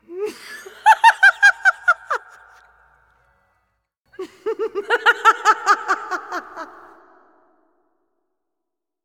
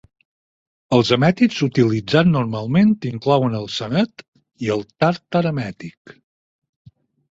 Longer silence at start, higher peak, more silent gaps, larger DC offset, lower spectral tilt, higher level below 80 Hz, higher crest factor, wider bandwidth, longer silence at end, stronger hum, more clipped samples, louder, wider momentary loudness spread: second, 0.1 s vs 0.9 s; about the same, 0 dBFS vs 0 dBFS; about the same, 4.00-4.05 s vs 4.28-4.33 s; neither; second, 0.5 dB/octave vs -7 dB/octave; second, -70 dBFS vs -54 dBFS; about the same, 20 dB vs 18 dB; first, 16.5 kHz vs 7.8 kHz; first, 2.4 s vs 1.5 s; neither; neither; first, -16 LUFS vs -19 LUFS; first, 24 LU vs 9 LU